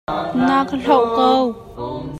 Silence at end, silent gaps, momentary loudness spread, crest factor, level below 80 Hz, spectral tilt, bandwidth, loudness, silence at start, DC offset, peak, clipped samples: 0 s; none; 13 LU; 16 dB; -46 dBFS; -6.5 dB/octave; 11.5 kHz; -17 LUFS; 0.1 s; under 0.1%; 0 dBFS; under 0.1%